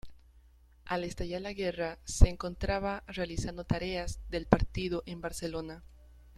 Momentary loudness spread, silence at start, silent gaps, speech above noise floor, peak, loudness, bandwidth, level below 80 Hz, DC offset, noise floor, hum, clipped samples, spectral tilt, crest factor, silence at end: 10 LU; 0.05 s; none; 28 dB; -6 dBFS; -34 LUFS; 13.5 kHz; -36 dBFS; under 0.1%; -60 dBFS; none; under 0.1%; -5.5 dB/octave; 26 dB; 0.05 s